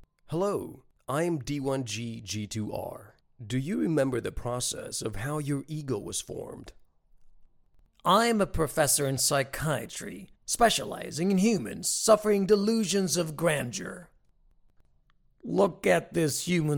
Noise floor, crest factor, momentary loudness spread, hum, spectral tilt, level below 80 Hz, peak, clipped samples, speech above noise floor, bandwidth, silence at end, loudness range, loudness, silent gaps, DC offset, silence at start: -64 dBFS; 22 dB; 14 LU; none; -4 dB/octave; -52 dBFS; -8 dBFS; under 0.1%; 37 dB; 19 kHz; 0 s; 7 LU; -28 LUFS; none; under 0.1%; 0.3 s